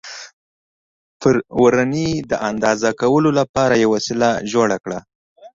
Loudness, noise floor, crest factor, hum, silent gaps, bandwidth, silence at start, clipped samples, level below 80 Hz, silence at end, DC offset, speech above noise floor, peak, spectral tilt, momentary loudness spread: -17 LUFS; under -90 dBFS; 16 dB; none; 0.33-1.20 s, 3.49-3.54 s, 5.15-5.36 s; 7.8 kHz; 0.05 s; under 0.1%; -50 dBFS; 0.1 s; under 0.1%; over 73 dB; -2 dBFS; -5.5 dB/octave; 9 LU